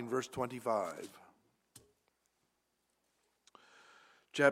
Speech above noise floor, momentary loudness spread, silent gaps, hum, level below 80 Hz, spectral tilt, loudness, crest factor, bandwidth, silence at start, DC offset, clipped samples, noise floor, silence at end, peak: 43 dB; 26 LU; none; none; -80 dBFS; -4.5 dB/octave; -37 LUFS; 28 dB; 16 kHz; 0 s; under 0.1%; under 0.1%; -81 dBFS; 0 s; -12 dBFS